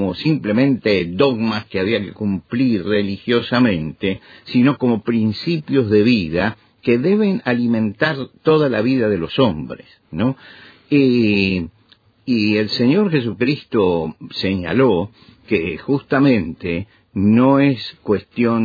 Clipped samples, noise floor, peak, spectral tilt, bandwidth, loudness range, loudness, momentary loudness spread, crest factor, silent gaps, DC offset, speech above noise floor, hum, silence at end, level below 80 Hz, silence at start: under 0.1%; -54 dBFS; -2 dBFS; -8.5 dB/octave; 5 kHz; 2 LU; -18 LUFS; 9 LU; 16 dB; none; under 0.1%; 37 dB; none; 0 s; -50 dBFS; 0 s